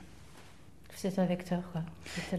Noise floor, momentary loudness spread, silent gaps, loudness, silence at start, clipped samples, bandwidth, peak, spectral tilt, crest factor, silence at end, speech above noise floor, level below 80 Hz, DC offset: -56 dBFS; 23 LU; none; -36 LUFS; 0 s; under 0.1%; 13.5 kHz; -18 dBFS; -6.5 dB/octave; 18 dB; 0 s; 22 dB; -60 dBFS; 0.2%